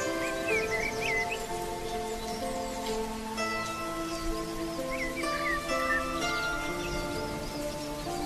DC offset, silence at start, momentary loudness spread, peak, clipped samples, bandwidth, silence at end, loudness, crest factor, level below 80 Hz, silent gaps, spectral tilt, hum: under 0.1%; 0 s; 6 LU; -16 dBFS; under 0.1%; 13.5 kHz; 0 s; -32 LUFS; 16 dB; -44 dBFS; none; -3.5 dB/octave; none